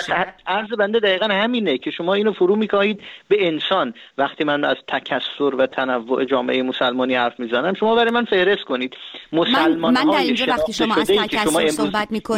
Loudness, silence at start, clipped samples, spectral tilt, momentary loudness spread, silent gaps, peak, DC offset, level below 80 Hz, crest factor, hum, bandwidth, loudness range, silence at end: -19 LUFS; 0 s; under 0.1%; -4 dB/octave; 6 LU; none; -4 dBFS; under 0.1%; -54 dBFS; 16 dB; none; 16.5 kHz; 3 LU; 0 s